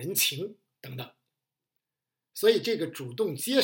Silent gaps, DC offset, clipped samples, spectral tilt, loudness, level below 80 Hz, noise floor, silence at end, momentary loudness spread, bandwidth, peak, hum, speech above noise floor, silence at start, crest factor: none; under 0.1%; under 0.1%; -3 dB/octave; -27 LUFS; -84 dBFS; -89 dBFS; 0 s; 19 LU; 17 kHz; -10 dBFS; none; 61 dB; 0 s; 22 dB